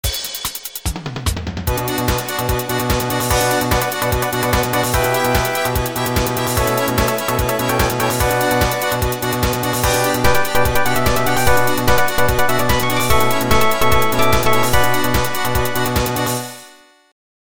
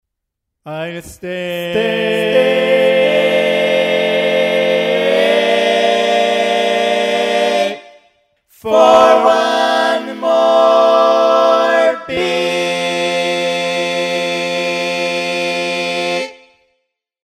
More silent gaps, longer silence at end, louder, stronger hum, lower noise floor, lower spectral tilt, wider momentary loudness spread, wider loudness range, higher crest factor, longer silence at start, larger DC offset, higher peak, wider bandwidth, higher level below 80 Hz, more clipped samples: neither; second, 0.3 s vs 0.9 s; second, -17 LUFS vs -13 LUFS; neither; second, -45 dBFS vs -77 dBFS; about the same, -4 dB/octave vs -3.5 dB/octave; second, 6 LU vs 9 LU; about the same, 3 LU vs 5 LU; about the same, 16 dB vs 14 dB; second, 0.05 s vs 0.65 s; neither; about the same, 0 dBFS vs 0 dBFS; first, over 20 kHz vs 15 kHz; first, -28 dBFS vs -58 dBFS; neither